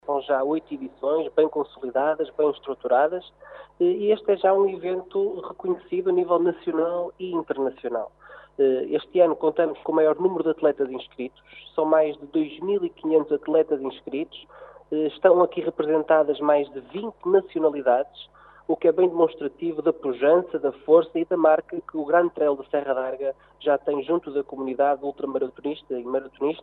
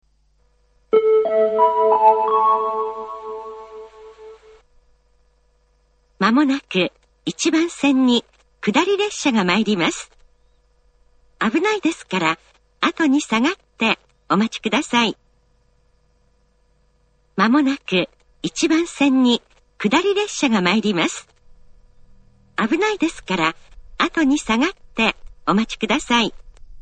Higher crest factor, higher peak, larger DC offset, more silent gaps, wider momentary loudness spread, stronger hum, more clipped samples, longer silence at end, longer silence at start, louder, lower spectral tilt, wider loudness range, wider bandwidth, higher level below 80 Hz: about the same, 20 dB vs 20 dB; about the same, -4 dBFS vs -2 dBFS; neither; neither; about the same, 11 LU vs 13 LU; neither; neither; about the same, 0 s vs 0 s; second, 0.1 s vs 0.95 s; second, -24 LUFS vs -19 LUFS; first, -9.5 dB/octave vs -4 dB/octave; about the same, 4 LU vs 5 LU; second, 4.2 kHz vs 9.4 kHz; second, -66 dBFS vs -50 dBFS